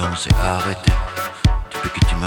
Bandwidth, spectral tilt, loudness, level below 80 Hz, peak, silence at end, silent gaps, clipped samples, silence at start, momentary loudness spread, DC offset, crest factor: 19 kHz; -5 dB/octave; -20 LUFS; -22 dBFS; -2 dBFS; 0 s; none; under 0.1%; 0 s; 6 LU; under 0.1%; 16 dB